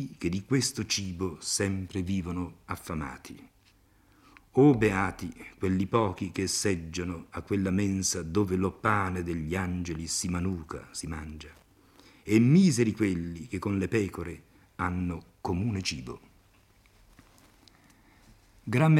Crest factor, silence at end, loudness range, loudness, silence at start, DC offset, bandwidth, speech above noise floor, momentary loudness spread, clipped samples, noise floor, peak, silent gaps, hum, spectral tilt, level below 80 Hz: 20 dB; 0 s; 8 LU; -29 LUFS; 0 s; under 0.1%; 15 kHz; 34 dB; 16 LU; under 0.1%; -63 dBFS; -10 dBFS; none; none; -5.5 dB/octave; -56 dBFS